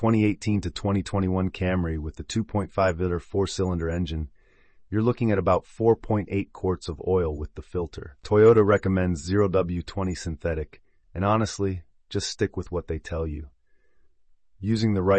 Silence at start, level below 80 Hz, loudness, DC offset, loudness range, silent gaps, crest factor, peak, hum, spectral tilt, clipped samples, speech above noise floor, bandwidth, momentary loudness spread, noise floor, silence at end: 0 s; -44 dBFS; -25 LUFS; under 0.1%; 6 LU; none; 18 dB; -8 dBFS; none; -7 dB/octave; under 0.1%; 34 dB; 8.8 kHz; 11 LU; -58 dBFS; 0 s